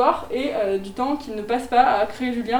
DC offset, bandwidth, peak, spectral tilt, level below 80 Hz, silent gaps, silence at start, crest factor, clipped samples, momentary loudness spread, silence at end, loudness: under 0.1%; 19.5 kHz; -4 dBFS; -5 dB/octave; -48 dBFS; none; 0 s; 18 dB; under 0.1%; 8 LU; 0 s; -22 LUFS